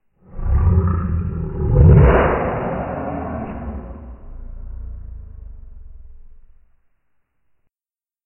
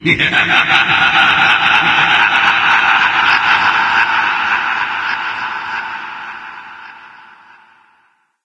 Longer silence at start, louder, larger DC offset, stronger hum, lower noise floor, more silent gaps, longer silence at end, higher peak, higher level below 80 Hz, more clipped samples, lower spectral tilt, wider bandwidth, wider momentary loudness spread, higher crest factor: first, 0.3 s vs 0 s; second, -17 LUFS vs -11 LUFS; neither; neither; first, under -90 dBFS vs -57 dBFS; neither; first, 2 s vs 1.35 s; about the same, 0 dBFS vs 0 dBFS; first, -24 dBFS vs -52 dBFS; neither; first, -13.5 dB/octave vs -3 dB/octave; second, 3.1 kHz vs 11 kHz; first, 27 LU vs 16 LU; about the same, 18 dB vs 14 dB